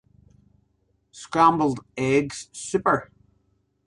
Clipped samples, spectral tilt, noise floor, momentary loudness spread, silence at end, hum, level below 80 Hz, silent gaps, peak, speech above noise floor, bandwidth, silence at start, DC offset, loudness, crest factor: under 0.1%; -5.5 dB/octave; -69 dBFS; 14 LU; 0.8 s; 50 Hz at -55 dBFS; -58 dBFS; none; -4 dBFS; 46 dB; 11.5 kHz; 1.15 s; under 0.1%; -23 LUFS; 22 dB